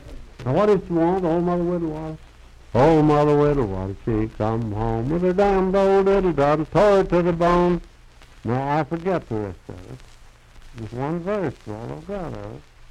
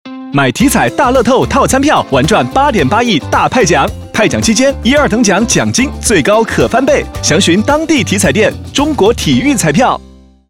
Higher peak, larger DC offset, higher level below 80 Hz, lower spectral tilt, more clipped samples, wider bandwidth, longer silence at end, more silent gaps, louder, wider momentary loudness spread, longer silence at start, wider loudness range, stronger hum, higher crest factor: second, -6 dBFS vs 0 dBFS; neither; second, -38 dBFS vs -28 dBFS; first, -8 dB/octave vs -4 dB/octave; neither; second, 10.5 kHz vs 16.5 kHz; second, 0.3 s vs 0.5 s; neither; second, -21 LUFS vs -10 LUFS; first, 16 LU vs 3 LU; about the same, 0 s vs 0.05 s; first, 10 LU vs 1 LU; neither; first, 16 dB vs 10 dB